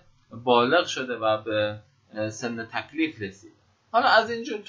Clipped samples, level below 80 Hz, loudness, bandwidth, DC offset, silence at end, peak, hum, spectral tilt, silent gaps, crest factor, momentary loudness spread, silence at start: under 0.1%; -64 dBFS; -25 LUFS; 7.8 kHz; under 0.1%; 0.05 s; -4 dBFS; none; -4 dB/octave; none; 22 dB; 14 LU; 0.3 s